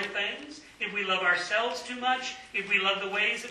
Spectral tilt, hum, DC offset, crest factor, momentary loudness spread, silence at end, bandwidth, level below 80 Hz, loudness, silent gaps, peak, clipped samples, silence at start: -2 dB/octave; none; under 0.1%; 18 dB; 8 LU; 0 s; 13 kHz; -68 dBFS; -28 LUFS; none; -12 dBFS; under 0.1%; 0 s